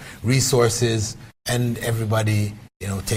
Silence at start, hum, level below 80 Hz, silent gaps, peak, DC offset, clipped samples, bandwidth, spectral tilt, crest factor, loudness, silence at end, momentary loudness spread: 0 s; none; -46 dBFS; 2.76-2.80 s; -6 dBFS; under 0.1%; under 0.1%; 16 kHz; -4.5 dB/octave; 16 dB; -22 LUFS; 0 s; 12 LU